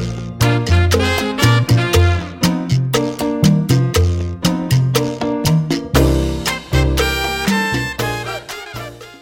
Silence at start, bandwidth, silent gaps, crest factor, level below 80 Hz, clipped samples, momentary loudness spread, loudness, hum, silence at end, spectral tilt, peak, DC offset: 0 s; 17 kHz; none; 16 dB; -26 dBFS; under 0.1%; 8 LU; -16 LUFS; none; 0.05 s; -5.5 dB/octave; 0 dBFS; under 0.1%